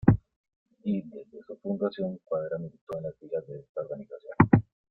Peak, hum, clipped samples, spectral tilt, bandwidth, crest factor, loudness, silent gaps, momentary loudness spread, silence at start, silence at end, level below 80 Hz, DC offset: -4 dBFS; none; under 0.1%; -11 dB/octave; 4.4 kHz; 26 dB; -30 LUFS; 0.36-0.44 s, 0.56-0.66 s, 2.81-2.87 s, 3.69-3.75 s; 18 LU; 0.05 s; 0.3 s; -52 dBFS; under 0.1%